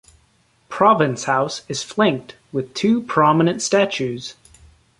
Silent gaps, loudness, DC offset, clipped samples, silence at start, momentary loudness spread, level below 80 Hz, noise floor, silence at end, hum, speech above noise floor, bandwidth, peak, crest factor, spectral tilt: none; -19 LUFS; under 0.1%; under 0.1%; 0.7 s; 14 LU; -58 dBFS; -60 dBFS; 0.7 s; none; 41 dB; 11.5 kHz; -2 dBFS; 18 dB; -5 dB/octave